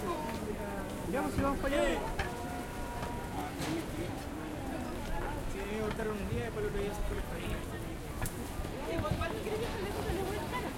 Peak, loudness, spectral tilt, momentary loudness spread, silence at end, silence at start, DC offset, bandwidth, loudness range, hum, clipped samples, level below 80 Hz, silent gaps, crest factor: -18 dBFS; -37 LUFS; -5.5 dB/octave; 7 LU; 0 s; 0 s; under 0.1%; 16.5 kHz; 3 LU; none; under 0.1%; -44 dBFS; none; 18 dB